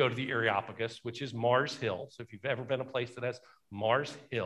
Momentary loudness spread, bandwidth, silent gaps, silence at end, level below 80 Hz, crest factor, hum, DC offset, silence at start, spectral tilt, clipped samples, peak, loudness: 11 LU; 12 kHz; none; 0 s; -68 dBFS; 20 dB; none; under 0.1%; 0 s; -5.5 dB/octave; under 0.1%; -14 dBFS; -33 LUFS